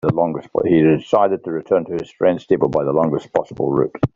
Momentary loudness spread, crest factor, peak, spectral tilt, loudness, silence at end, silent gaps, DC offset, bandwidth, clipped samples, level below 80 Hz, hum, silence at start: 7 LU; 16 dB; -2 dBFS; -7.5 dB/octave; -18 LUFS; 0.1 s; none; under 0.1%; 7.4 kHz; under 0.1%; -50 dBFS; none; 0.05 s